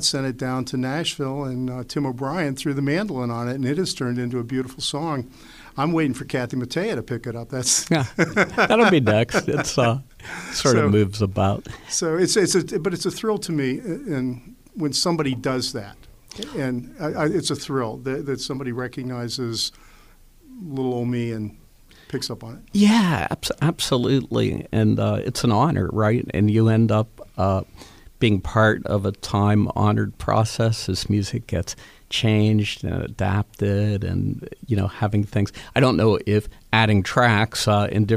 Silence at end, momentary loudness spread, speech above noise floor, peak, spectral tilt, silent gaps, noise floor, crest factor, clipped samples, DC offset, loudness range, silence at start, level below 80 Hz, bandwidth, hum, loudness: 0 s; 11 LU; 28 dB; -2 dBFS; -5 dB/octave; none; -50 dBFS; 20 dB; under 0.1%; under 0.1%; 7 LU; 0 s; -46 dBFS; 15 kHz; none; -22 LUFS